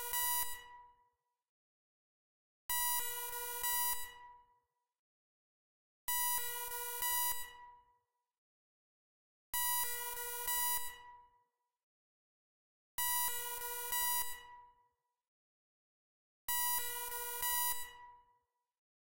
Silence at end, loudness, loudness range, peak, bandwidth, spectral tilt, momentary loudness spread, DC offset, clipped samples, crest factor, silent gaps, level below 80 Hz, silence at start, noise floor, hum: 0.3 s; -36 LUFS; 2 LU; -20 dBFS; 16 kHz; 2.5 dB/octave; 13 LU; under 0.1%; under 0.1%; 22 dB; 1.49-2.69 s, 4.99-6.08 s, 8.38-9.53 s, 11.83-12.98 s, 15.28-16.48 s; -68 dBFS; 0 s; -80 dBFS; none